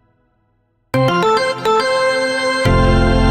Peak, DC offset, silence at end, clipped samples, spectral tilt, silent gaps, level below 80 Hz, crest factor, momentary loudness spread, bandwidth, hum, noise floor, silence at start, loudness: -2 dBFS; under 0.1%; 0 s; under 0.1%; -5.5 dB/octave; none; -24 dBFS; 14 dB; 3 LU; 15 kHz; none; -62 dBFS; 0.95 s; -15 LUFS